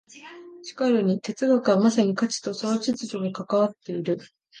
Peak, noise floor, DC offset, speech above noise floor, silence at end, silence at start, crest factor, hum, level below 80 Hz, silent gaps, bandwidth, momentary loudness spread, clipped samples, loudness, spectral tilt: -8 dBFS; -44 dBFS; under 0.1%; 21 dB; 0 s; 0.15 s; 16 dB; none; -72 dBFS; none; 9.8 kHz; 19 LU; under 0.1%; -24 LUFS; -5.5 dB/octave